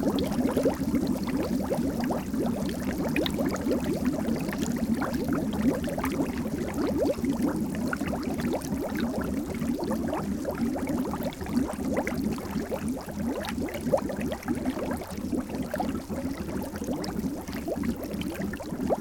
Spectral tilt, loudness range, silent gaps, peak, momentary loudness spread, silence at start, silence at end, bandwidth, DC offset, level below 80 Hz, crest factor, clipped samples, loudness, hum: -6 dB/octave; 4 LU; none; -10 dBFS; 6 LU; 0 s; 0 s; 17.5 kHz; under 0.1%; -44 dBFS; 18 dB; under 0.1%; -30 LUFS; none